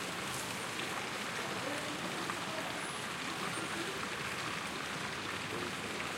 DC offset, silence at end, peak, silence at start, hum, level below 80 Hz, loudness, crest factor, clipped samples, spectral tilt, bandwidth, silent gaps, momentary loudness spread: under 0.1%; 0 s; -20 dBFS; 0 s; none; -68 dBFS; -38 LUFS; 18 dB; under 0.1%; -2.5 dB/octave; 16 kHz; none; 1 LU